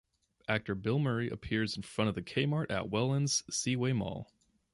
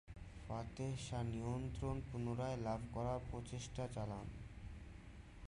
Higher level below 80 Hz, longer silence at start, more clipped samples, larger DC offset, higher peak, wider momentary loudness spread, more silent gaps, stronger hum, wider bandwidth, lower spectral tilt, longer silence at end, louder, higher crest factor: about the same, -58 dBFS vs -56 dBFS; first, 0.5 s vs 0.05 s; neither; neither; first, -16 dBFS vs -30 dBFS; second, 5 LU vs 12 LU; neither; neither; about the same, 11.5 kHz vs 11 kHz; second, -4.5 dB/octave vs -6.5 dB/octave; first, 0.5 s vs 0 s; first, -33 LUFS vs -46 LUFS; about the same, 18 dB vs 14 dB